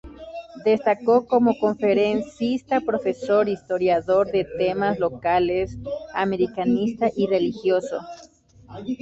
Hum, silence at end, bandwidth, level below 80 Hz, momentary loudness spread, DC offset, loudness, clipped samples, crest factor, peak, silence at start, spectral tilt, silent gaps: none; 0.05 s; 8 kHz; -52 dBFS; 12 LU; under 0.1%; -22 LUFS; under 0.1%; 16 dB; -6 dBFS; 0.05 s; -7 dB/octave; none